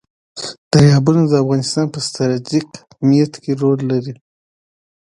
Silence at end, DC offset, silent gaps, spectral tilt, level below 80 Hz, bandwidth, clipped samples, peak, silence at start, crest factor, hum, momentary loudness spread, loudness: 0.9 s; under 0.1%; 0.58-0.71 s; -6.5 dB/octave; -48 dBFS; 11.5 kHz; under 0.1%; 0 dBFS; 0.35 s; 16 dB; none; 17 LU; -15 LUFS